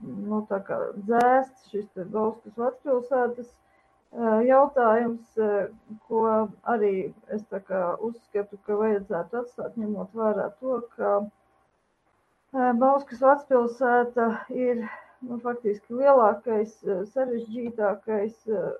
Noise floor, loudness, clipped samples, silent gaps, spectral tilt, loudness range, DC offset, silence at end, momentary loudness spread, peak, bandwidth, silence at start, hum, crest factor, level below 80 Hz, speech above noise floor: -69 dBFS; -26 LUFS; under 0.1%; none; -8 dB/octave; 5 LU; under 0.1%; 0 s; 13 LU; -6 dBFS; 9 kHz; 0 s; none; 20 dB; -72 dBFS; 44 dB